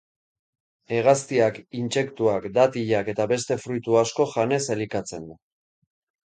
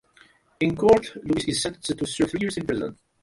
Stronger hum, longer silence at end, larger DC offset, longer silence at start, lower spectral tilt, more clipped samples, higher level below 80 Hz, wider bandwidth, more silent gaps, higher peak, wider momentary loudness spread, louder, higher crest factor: neither; first, 1 s vs 0.3 s; neither; first, 0.9 s vs 0.6 s; about the same, -5 dB/octave vs -4.5 dB/octave; neither; second, -62 dBFS vs -50 dBFS; second, 9.6 kHz vs 11.5 kHz; neither; about the same, -6 dBFS vs -4 dBFS; about the same, 10 LU vs 10 LU; about the same, -23 LUFS vs -24 LUFS; about the same, 18 dB vs 20 dB